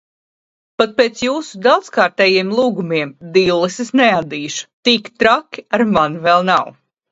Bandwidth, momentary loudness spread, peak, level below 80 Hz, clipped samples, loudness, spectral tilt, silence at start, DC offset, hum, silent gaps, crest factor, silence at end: 8 kHz; 7 LU; 0 dBFS; -56 dBFS; under 0.1%; -15 LUFS; -4.5 dB/octave; 0.8 s; under 0.1%; none; 4.73-4.83 s; 16 dB; 0.4 s